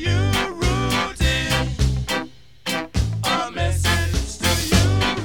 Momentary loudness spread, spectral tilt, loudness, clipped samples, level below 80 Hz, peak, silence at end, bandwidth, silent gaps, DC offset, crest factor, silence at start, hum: 8 LU; -4.5 dB/octave; -21 LUFS; under 0.1%; -28 dBFS; -4 dBFS; 0 s; 18.5 kHz; none; 0.6%; 16 dB; 0 s; none